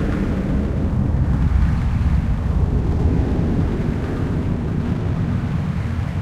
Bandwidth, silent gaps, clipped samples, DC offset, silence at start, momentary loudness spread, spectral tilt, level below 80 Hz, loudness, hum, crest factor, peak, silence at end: 8.4 kHz; none; under 0.1%; under 0.1%; 0 s; 4 LU; -9 dB/octave; -24 dBFS; -21 LUFS; none; 14 dB; -6 dBFS; 0 s